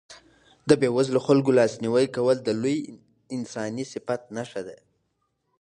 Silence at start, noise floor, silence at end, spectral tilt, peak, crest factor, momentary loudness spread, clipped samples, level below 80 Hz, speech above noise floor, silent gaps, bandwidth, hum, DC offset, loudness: 0.1 s; -74 dBFS; 0.85 s; -6 dB/octave; -4 dBFS; 22 dB; 15 LU; under 0.1%; -66 dBFS; 51 dB; none; 11 kHz; none; under 0.1%; -24 LUFS